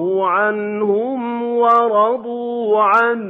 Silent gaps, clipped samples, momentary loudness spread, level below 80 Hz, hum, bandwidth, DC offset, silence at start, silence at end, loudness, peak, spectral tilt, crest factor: none; under 0.1%; 9 LU; -72 dBFS; none; 6.4 kHz; under 0.1%; 0 s; 0 s; -16 LUFS; -4 dBFS; -7.5 dB/octave; 12 dB